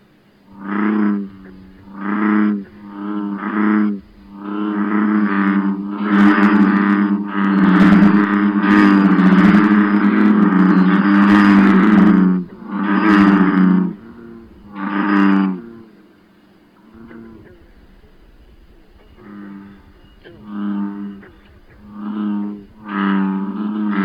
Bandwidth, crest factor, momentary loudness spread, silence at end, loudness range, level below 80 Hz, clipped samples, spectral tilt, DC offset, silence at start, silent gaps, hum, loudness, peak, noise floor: 5.4 kHz; 12 dB; 18 LU; 0 s; 16 LU; -50 dBFS; under 0.1%; -9 dB/octave; under 0.1%; 0.6 s; none; none; -14 LUFS; -4 dBFS; -50 dBFS